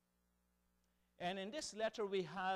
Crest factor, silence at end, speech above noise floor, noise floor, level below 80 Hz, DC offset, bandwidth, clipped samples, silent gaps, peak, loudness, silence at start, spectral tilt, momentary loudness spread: 16 dB; 0 s; 39 dB; -82 dBFS; -78 dBFS; under 0.1%; 14 kHz; under 0.1%; none; -30 dBFS; -44 LUFS; 1.2 s; -3.5 dB/octave; 5 LU